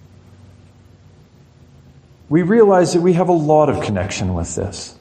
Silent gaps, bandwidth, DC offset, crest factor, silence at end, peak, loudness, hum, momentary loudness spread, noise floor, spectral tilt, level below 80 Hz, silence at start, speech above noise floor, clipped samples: none; 10 kHz; under 0.1%; 16 dB; 0.1 s; -2 dBFS; -16 LUFS; none; 11 LU; -47 dBFS; -6.5 dB/octave; -44 dBFS; 2.3 s; 32 dB; under 0.1%